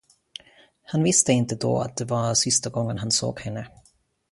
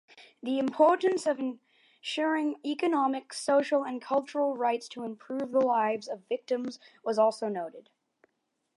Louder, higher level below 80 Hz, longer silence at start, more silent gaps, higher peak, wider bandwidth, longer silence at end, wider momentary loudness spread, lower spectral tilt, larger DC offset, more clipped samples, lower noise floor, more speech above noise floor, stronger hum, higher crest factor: first, -23 LUFS vs -29 LUFS; first, -56 dBFS vs -86 dBFS; first, 0.9 s vs 0.15 s; neither; first, -4 dBFS vs -10 dBFS; about the same, 11.5 kHz vs 11.5 kHz; second, 0.65 s vs 0.95 s; first, 23 LU vs 13 LU; about the same, -4 dB/octave vs -4 dB/octave; neither; neither; second, -62 dBFS vs -80 dBFS; second, 39 dB vs 51 dB; neither; about the same, 20 dB vs 20 dB